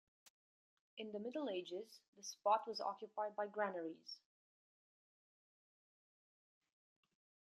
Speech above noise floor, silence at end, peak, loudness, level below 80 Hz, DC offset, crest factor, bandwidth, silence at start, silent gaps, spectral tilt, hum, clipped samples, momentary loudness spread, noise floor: over 46 dB; 3.4 s; -24 dBFS; -44 LUFS; under -90 dBFS; under 0.1%; 24 dB; 13 kHz; 0.95 s; 2.08-2.13 s; -3.5 dB/octave; none; under 0.1%; 16 LU; under -90 dBFS